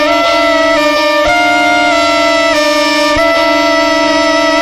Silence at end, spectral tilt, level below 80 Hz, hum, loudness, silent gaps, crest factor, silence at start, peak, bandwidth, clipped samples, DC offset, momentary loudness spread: 0 s; -2.5 dB/octave; -36 dBFS; none; -9 LUFS; none; 10 dB; 0 s; 0 dBFS; 15.5 kHz; under 0.1%; under 0.1%; 1 LU